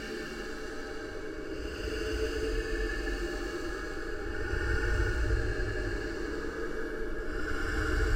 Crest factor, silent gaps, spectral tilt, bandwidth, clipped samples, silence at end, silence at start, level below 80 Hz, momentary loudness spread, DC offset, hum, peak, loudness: 16 dB; none; -5.5 dB/octave; 16 kHz; under 0.1%; 0 s; 0 s; -36 dBFS; 8 LU; under 0.1%; none; -16 dBFS; -35 LUFS